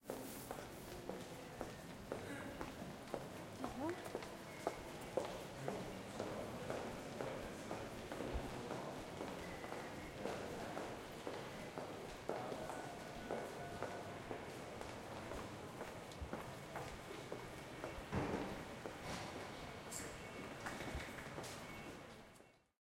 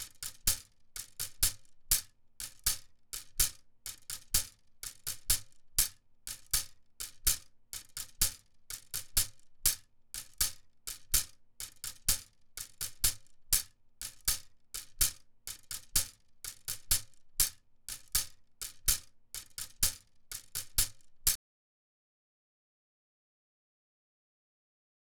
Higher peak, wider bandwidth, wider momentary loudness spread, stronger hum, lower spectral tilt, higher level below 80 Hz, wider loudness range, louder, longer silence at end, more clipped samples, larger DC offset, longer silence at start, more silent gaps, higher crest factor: second, -24 dBFS vs -8 dBFS; second, 16.5 kHz vs over 20 kHz; second, 5 LU vs 15 LU; neither; first, -4.5 dB/octave vs 0.5 dB/octave; second, -62 dBFS vs -48 dBFS; about the same, 3 LU vs 2 LU; second, -48 LUFS vs -33 LUFS; second, 0.25 s vs 3.8 s; neither; neither; about the same, 0 s vs 0 s; neither; about the same, 24 dB vs 28 dB